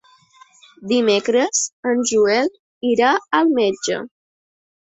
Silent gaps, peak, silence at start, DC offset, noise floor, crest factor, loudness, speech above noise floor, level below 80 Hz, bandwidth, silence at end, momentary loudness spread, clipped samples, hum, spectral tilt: 1.72-1.83 s, 2.59-2.81 s; -2 dBFS; 0.8 s; under 0.1%; -51 dBFS; 18 dB; -18 LUFS; 33 dB; -64 dBFS; 8.4 kHz; 0.85 s; 9 LU; under 0.1%; none; -2.5 dB/octave